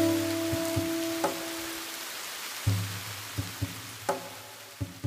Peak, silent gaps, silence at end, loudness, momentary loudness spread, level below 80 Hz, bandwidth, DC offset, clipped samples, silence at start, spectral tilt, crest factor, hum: -14 dBFS; none; 0 s; -32 LUFS; 8 LU; -54 dBFS; 15.5 kHz; under 0.1%; under 0.1%; 0 s; -4.5 dB/octave; 18 dB; none